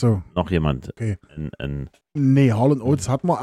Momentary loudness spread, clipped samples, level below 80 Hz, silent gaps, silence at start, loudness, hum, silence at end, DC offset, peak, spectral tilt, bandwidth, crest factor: 14 LU; under 0.1%; -40 dBFS; none; 0 s; -21 LUFS; none; 0 s; under 0.1%; -6 dBFS; -7.5 dB/octave; 12 kHz; 14 dB